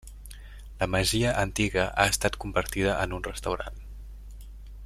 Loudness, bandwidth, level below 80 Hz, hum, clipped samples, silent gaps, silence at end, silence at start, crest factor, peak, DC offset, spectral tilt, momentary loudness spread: -27 LUFS; 16 kHz; -40 dBFS; none; under 0.1%; none; 0 s; 0.05 s; 26 dB; -4 dBFS; under 0.1%; -4 dB/octave; 22 LU